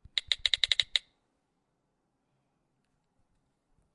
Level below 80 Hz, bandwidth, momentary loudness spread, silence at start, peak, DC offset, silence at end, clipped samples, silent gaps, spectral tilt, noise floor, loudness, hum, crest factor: -64 dBFS; 11.5 kHz; 6 LU; 0.15 s; -6 dBFS; under 0.1%; 2.95 s; under 0.1%; none; 2 dB/octave; -78 dBFS; -28 LUFS; none; 30 dB